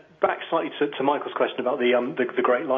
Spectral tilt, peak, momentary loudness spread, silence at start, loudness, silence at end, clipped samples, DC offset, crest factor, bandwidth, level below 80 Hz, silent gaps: -7.5 dB/octave; -6 dBFS; 4 LU; 0.2 s; -24 LUFS; 0 s; under 0.1%; under 0.1%; 18 dB; 3.8 kHz; -76 dBFS; none